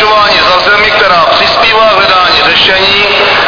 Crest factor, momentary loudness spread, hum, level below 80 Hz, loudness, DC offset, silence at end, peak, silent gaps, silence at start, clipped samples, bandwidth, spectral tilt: 6 dB; 1 LU; none; -34 dBFS; -4 LUFS; under 0.1%; 0 s; 0 dBFS; none; 0 s; 3%; 5.4 kHz; -3 dB/octave